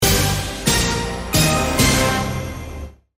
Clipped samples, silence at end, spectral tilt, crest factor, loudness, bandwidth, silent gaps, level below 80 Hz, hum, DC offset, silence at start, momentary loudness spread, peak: under 0.1%; 0.25 s; -3.5 dB/octave; 16 dB; -18 LUFS; 16 kHz; none; -30 dBFS; none; under 0.1%; 0 s; 15 LU; -2 dBFS